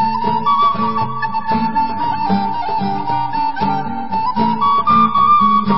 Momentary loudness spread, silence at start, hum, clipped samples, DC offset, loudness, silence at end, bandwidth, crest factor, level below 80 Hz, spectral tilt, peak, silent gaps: 8 LU; 0 s; none; under 0.1%; 5%; -16 LUFS; 0 s; 5.8 kHz; 12 dB; -46 dBFS; -11 dB/octave; -2 dBFS; none